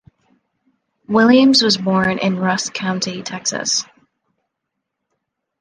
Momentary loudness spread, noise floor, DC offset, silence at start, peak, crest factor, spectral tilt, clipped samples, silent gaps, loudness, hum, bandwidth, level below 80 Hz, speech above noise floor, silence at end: 11 LU; -78 dBFS; under 0.1%; 1.1 s; -2 dBFS; 18 dB; -3.5 dB/octave; under 0.1%; none; -16 LUFS; none; 10 kHz; -58 dBFS; 62 dB; 1.75 s